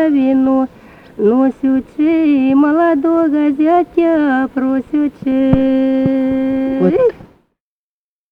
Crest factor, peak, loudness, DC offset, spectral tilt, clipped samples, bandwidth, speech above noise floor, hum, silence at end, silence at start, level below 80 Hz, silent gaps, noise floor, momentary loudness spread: 12 dB; -2 dBFS; -14 LUFS; under 0.1%; -9 dB/octave; under 0.1%; 4.8 kHz; over 77 dB; none; 1.05 s; 0 s; -42 dBFS; none; under -90 dBFS; 5 LU